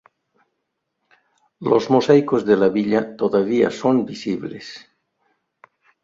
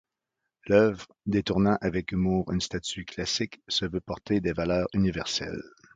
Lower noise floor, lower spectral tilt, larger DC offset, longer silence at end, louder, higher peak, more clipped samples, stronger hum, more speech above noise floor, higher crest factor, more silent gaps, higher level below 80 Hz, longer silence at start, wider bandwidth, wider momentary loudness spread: second, -76 dBFS vs -85 dBFS; first, -7 dB/octave vs -5 dB/octave; neither; first, 1.25 s vs 0.25 s; first, -19 LUFS vs -28 LUFS; first, -2 dBFS vs -8 dBFS; neither; neither; about the same, 58 dB vs 57 dB; about the same, 18 dB vs 20 dB; neither; second, -62 dBFS vs -48 dBFS; first, 1.6 s vs 0.65 s; second, 7.6 kHz vs 9.2 kHz; first, 15 LU vs 10 LU